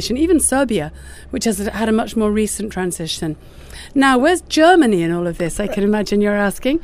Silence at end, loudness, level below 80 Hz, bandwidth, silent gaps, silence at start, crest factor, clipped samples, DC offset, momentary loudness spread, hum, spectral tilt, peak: 0 s; -17 LUFS; -36 dBFS; 16 kHz; none; 0 s; 16 dB; under 0.1%; under 0.1%; 10 LU; none; -4.5 dB/octave; 0 dBFS